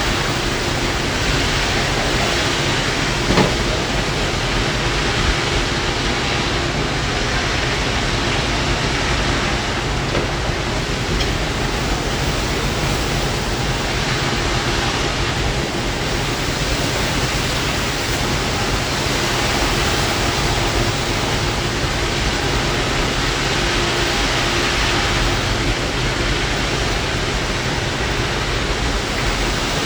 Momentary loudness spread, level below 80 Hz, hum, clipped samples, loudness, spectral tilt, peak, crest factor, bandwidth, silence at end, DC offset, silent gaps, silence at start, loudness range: 3 LU; -26 dBFS; none; under 0.1%; -18 LUFS; -3.5 dB/octave; 0 dBFS; 18 dB; over 20 kHz; 0 s; under 0.1%; none; 0 s; 2 LU